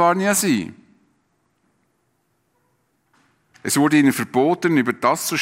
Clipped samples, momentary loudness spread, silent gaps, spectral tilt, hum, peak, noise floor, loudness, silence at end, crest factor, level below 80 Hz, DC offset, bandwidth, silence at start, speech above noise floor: under 0.1%; 7 LU; none; -4 dB/octave; none; -2 dBFS; -68 dBFS; -18 LUFS; 0 s; 18 dB; -66 dBFS; under 0.1%; 16 kHz; 0 s; 50 dB